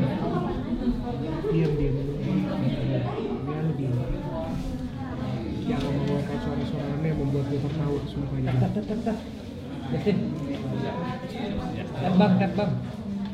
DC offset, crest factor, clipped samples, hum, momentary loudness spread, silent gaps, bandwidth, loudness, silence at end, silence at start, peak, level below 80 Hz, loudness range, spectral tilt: under 0.1%; 18 dB; under 0.1%; none; 8 LU; none; 10.5 kHz; -28 LUFS; 0 s; 0 s; -8 dBFS; -42 dBFS; 3 LU; -8.5 dB/octave